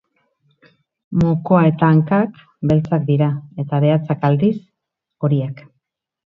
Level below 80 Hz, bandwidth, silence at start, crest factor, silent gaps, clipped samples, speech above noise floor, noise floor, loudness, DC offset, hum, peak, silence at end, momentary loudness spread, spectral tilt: -48 dBFS; 4.9 kHz; 1.1 s; 18 dB; none; under 0.1%; 63 dB; -79 dBFS; -17 LUFS; under 0.1%; none; 0 dBFS; 0.7 s; 11 LU; -10.5 dB/octave